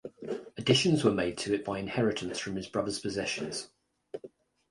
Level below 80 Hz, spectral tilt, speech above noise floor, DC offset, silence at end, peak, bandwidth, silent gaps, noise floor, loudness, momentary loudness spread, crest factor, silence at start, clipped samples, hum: -60 dBFS; -4.5 dB/octave; 23 dB; under 0.1%; 0.45 s; -10 dBFS; 11.5 kHz; none; -53 dBFS; -31 LUFS; 20 LU; 22 dB; 0.05 s; under 0.1%; none